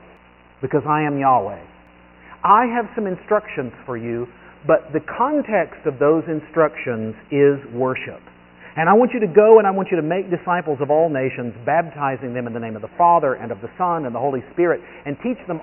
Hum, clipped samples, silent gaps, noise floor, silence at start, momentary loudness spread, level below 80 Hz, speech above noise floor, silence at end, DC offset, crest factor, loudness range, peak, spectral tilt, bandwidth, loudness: 60 Hz at -50 dBFS; under 0.1%; none; -49 dBFS; 0.6 s; 14 LU; -56 dBFS; 30 dB; 0 s; under 0.1%; 20 dB; 5 LU; 0 dBFS; -2.5 dB/octave; 3.1 kHz; -19 LUFS